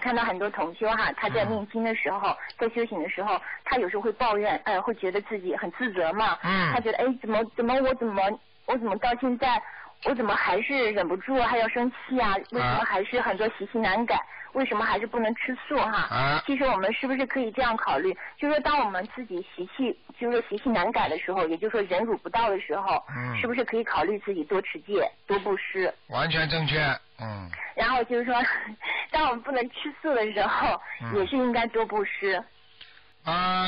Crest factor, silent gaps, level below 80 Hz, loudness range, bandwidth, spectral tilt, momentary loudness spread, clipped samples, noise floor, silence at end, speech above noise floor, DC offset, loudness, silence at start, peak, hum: 10 dB; none; -52 dBFS; 2 LU; 5.6 kHz; -3 dB/octave; 6 LU; under 0.1%; -53 dBFS; 0 s; 26 dB; under 0.1%; -27 LUFS; 0 s; -18 dBFS; none